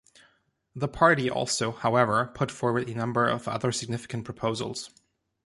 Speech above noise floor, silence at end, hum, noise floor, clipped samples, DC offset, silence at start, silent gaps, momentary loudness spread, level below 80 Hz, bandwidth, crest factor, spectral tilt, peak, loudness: 41 dB; 0.6 s; none; -68 dBFS; under 0.1%; under 0.1%; 0.75 s; none; 12 LU; -58 dBFS; 11.5 kHz; 22 dB; -4.5 dB/octave; -6 dBFS; -27 LUFS